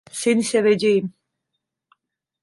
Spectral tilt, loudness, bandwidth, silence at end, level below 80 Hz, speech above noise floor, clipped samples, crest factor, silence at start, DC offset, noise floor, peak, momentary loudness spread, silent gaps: -4.5 dB/octave; -19 LUFS; 11.5 kHz; 1.35 s; -68 dBFS; 61 dB; under 0.1%; 16 dB; 0.15 s; under 0.1%; -80 dBFS; -6 dBFS; 5 LU; none